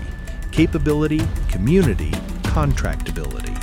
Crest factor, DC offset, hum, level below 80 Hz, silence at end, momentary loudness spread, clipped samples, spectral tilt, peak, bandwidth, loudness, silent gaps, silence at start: 16 dB; under 0.1%; none; -24 dBFS; 0 s; 11 LU; under 0.1%; -7 dB/octave; -2 dBFS; 16.5 kHz; -20 LUFS; none; 0 s